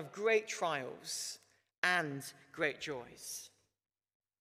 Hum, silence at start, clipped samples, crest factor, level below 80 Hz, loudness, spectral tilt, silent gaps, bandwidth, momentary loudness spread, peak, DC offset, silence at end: none; 0 s; under 0.1%; 24 dB; -80 dBFS; -37 LUFS; -2.5 dB/octave; 1.78-1.82 s; 15.5 kHz; 14 LU; -14 dBFS; under 0.1%; 0.95 s